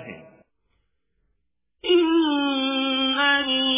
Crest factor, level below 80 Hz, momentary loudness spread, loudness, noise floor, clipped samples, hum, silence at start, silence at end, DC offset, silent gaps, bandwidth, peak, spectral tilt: 16 dB; -62 dBFS; 5 LU; -20 LUFS; -76 dBFS; under 0.1%; none; 0 s; 0 s; under 0.1%; none; 3.8 kHz; -8 dBFS; 1 dB/octave